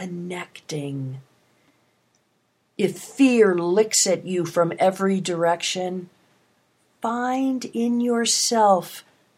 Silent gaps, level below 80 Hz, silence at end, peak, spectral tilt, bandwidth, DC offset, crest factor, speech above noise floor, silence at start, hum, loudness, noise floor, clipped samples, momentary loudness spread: none; -76 dBFS; 0.35 s; -6 dBFS; -3.5 dB/octave; 16 kHz; under 0.1%; 18 dB; 46 dB; 0 s; none; -22 LUFS; -68 dBFS; under 0.1%; 15 LU